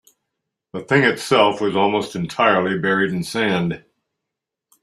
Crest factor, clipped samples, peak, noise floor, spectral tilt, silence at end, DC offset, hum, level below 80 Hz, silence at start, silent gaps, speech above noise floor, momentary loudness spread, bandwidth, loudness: 18 dB; under 0.1%; -2 dBFS; -83 dBFS; -5.5 dB/octave; 1.05 s; under 0.1%; none; -60 dBFS; 0.75 s; none; 64 dB; 10 LU; 13.5 kHz; -18 LUFS